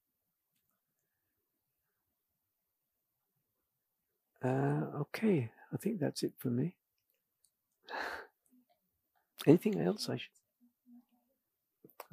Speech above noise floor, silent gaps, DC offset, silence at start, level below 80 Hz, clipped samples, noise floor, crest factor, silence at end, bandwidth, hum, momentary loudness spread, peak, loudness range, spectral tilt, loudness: 53 dB; none; under 0.1%; 4.4 s; -84 dBFS; under 0.1%; -86 dBFS; 28 dB; 1.15 s; 15.5 kHz; none; 14 LU; -12 dBFS; 6 LU; -6.5 dB/octave; -35 LUFS